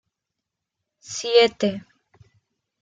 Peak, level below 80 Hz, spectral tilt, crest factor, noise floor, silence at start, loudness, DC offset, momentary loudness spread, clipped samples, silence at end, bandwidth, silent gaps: -4 dBFS; -68 dBFS; -3.5 dB/octave; 22 dB; -84 dBFS; 1.05 s; -20 LUFS; under 0.1%; 17 LU; under 0.1%; 1 s; 9.2 kHz; none